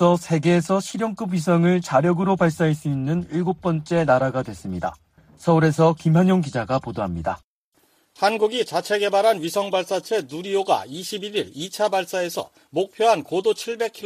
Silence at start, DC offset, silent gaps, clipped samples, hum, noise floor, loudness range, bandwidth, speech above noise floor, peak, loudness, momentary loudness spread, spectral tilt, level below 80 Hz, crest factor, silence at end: 0 s; under 0.1%; 7.44-7.72 s; under 0.1%; none; -64 dBFS; 3 LU; 15.5 kHz; 43 dB; -4 dBFS; -22 LUFS; 10 LU; -6 dB/octave; -54 dBFS; 16 dB; 0 s